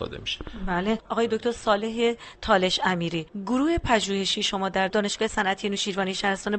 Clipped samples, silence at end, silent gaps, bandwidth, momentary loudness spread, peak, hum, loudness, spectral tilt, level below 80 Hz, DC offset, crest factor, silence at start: under 0.1%; 0 s; none; 8.8 kHz; 7 LU; -6 dBFS; none; -25 LUFS; -4 dB/octave; -44 dBFS; under 0.1%; 18 dB; 0 s